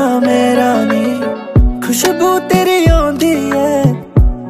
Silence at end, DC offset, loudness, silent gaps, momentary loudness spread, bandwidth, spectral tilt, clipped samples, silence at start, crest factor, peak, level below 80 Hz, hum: 0 s; under 0.1%; -12 LUFS; none; 4 LU; 15.5 kHz; -5.5 dB/octave; under 0.1%; 0 s; 12 dB; 0 dBFS; -20 dBFS; none